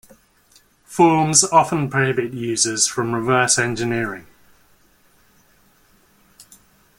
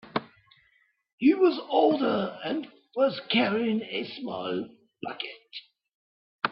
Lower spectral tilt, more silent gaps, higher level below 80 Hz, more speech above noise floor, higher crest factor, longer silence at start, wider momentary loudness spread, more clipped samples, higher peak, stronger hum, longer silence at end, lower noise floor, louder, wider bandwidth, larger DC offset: second, -3 dB/octave vs -9 dB/octave; second, none vs 1.13-1.18 s, 5.95-6.39 s; first, -56 dBFS vs -72 dBFS; second, 38 dB vs 42 dB; about the same, 22 dB vs 20 dB; first, 0.9 s vs 0.05 s; second, 11 LU vs 16 LU; neither; first, 0 dBFS vs -8 dBFS; neither; first, 2.8 s vs 0 s; second, -56 dBFS vs -68 dBFS; first, -17 LUFS vs -27 LUFS; first, 16.5 kHz vs 5.8 kHz; neither